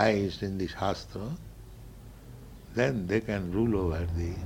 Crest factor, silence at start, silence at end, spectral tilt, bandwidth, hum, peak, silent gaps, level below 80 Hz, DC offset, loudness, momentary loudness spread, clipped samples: 22 dB; 0 s; 0 s; -7 dB/octave; 16.5 kHz; none; -8 dBFS; none; -44 dBFS; under 0.1%; -31 LUFS; 21 LU; under 0.1%